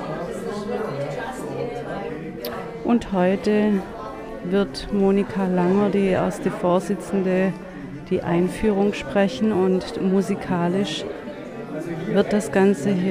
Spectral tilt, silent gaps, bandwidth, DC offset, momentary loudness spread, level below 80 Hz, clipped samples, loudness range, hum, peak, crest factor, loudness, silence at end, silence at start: -7 dB/octave; none; 15.5 kHz; under 0.1%; 12 LU; -46 dBFS; under 0.1%; 3 LU; none; -4 dBFS; 18 dB; -22 LUFS; 0 s; 0 s